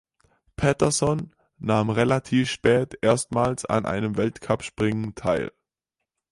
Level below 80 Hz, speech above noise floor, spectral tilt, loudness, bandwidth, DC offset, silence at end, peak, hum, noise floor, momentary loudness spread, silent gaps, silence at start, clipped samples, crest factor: -50 dBFS; 62 dB; -5.5 dB/octave; -24 LUFS; 11.5 kHz; under 0.1%; 0.8 s; -6 dBFS; none; -85 dBFS; 6 LU; none; 0.6 s; under 0.1%; 20 dB